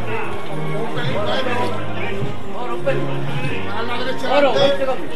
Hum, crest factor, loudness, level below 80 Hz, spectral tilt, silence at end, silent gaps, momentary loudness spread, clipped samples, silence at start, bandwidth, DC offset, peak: none; 20 dB; -21 LUFS; -42 dBFS; -6 dB/octave; 0 s; none; 10 LU; under 0.1%; 0 s; 13.5 kHz; 10%; 0 dBFS